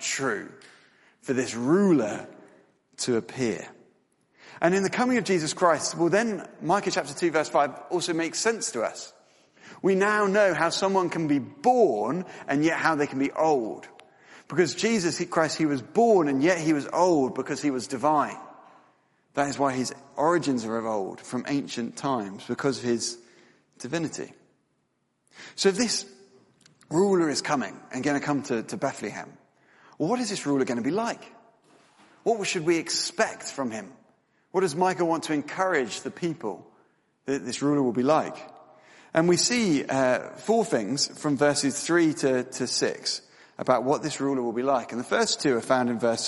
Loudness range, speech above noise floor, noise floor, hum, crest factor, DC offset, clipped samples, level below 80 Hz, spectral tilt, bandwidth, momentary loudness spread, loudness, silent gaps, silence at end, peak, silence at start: 6 LU; 48 dB; -73 dBFS; none; 20 dB; under 0.1%; under 0.1%; -70 dBFS; -4 dB/octave; 11.5 kHz; 11 LU; -26 LUFS; none; 0 s; -6 dBFS; 0 s